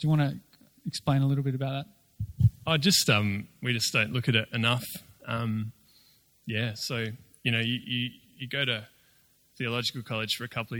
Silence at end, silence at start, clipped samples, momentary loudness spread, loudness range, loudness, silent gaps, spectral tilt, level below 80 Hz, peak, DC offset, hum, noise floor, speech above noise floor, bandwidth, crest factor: 0 s; 0 s; under 0.1%; 14 LU; 6 LU; -28 LUFS; none; -4.5 dB/octave; -56 dBFS; -10 dBFS; under 0.1%; none; -64 dBFS; 36 dB; 19.5 kHz; 20 dB